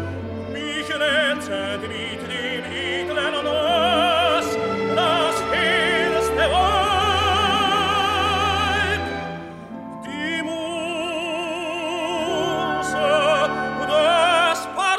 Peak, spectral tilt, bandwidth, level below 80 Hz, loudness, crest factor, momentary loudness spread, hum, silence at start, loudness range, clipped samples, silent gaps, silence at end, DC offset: -6 dBFS; -3.5 dB/octave; 15.5 kHz; -42 dBFS; -20 LUFS; 14 dB; 10 LU; none; 0 s; 6 LU; under 0.1%; none; 0 s; under 0.1%